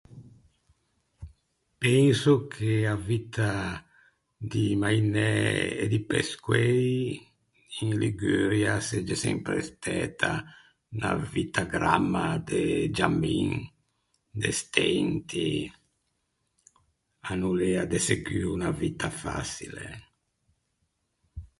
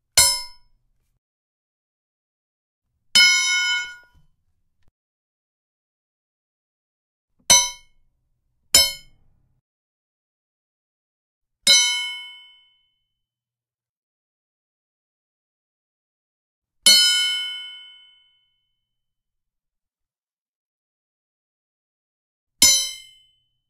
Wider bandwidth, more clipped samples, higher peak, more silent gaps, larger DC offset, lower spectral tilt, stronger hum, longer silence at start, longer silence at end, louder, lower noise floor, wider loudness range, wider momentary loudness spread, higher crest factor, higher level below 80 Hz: second, 11.5 kHz vs 15.5 kHz; neither; second, -4 dBFS vs 0 dBFS; second, none vs 1.18-2.82 s, 4.91-7.28 s, 9.61-11.41 s, 13.89-16.62 s, 20.33-22.47 s; neither; first, -5.5 dB/octave vs 2 dB/octave; neither; about the same, 0.1 s vs 0.15 s; second, 0.15 s vs 0.7 s; second, -27 LUFS vs -16 LUFS; second, -77 dBFS vs under -90 dBFS; about the same, 4 LU vs 4 LU; second, 11 LU vs 16 LU; about the same, 24 dB vs 26 dB; first, -50 dBFS vs -56 dBFS